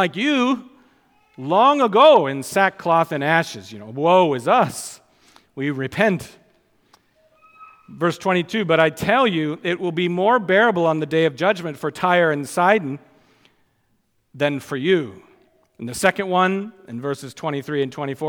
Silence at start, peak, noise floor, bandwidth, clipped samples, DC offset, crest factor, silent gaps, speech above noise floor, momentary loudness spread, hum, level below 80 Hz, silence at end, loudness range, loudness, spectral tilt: 0 s; -2 dBFS; -66 dBFS; 18.5 kHz; under 0.1%; under 0.1%; 20 dB; none; 47 dB; 12 LU; none; -62 dBFS; 0 s; 7 LU; -19 LUFS; -5 dB/octave